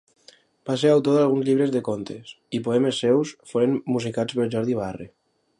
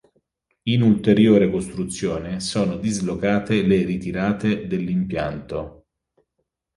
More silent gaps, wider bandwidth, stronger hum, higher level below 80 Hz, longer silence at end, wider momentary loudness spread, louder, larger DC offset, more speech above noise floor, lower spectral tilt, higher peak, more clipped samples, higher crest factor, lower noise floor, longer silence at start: neither; about the same, 11.5 kHz vs 11.5 kHz; neither; second, -62 dBFS vs -46 dBFS; second, 0.5 s vs 1.05 s; about the same, 13 LU vs 12 LU; about the same, -23 LUFS vs -21 LUFS; neither; second, 33 dB vs 56 dB; about the same, -6.5 dB/octave vs -6.5 dB/octave; about the same, -6 dBFS vs -4 dBFS; neither; about the same, 16 dB vs 18 dB; second, -55 dBFS vs -76 dBFS; about the same, 0.65 s vs 0.65 s